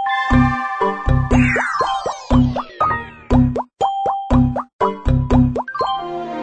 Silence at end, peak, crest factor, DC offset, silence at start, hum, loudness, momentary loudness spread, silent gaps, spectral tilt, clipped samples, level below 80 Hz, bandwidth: 0 s; -2 dBFS; 16 dB; under 0.1%; 0 s; none; -18 LUFS; 6 LU; 4.73-4.79 s; -7 dB/octave; under 0.1%; -26 dBFS; 9 kHz